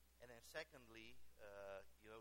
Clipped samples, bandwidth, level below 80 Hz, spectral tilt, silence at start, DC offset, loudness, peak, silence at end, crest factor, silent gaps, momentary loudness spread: under 0.1%; 16.5 kHz; -76 dBFS; -3 dB/octave; 0 s; under 0.1%; -59 LUFS; -36 dBFS; 0 s; 22 dB; none; 10 LU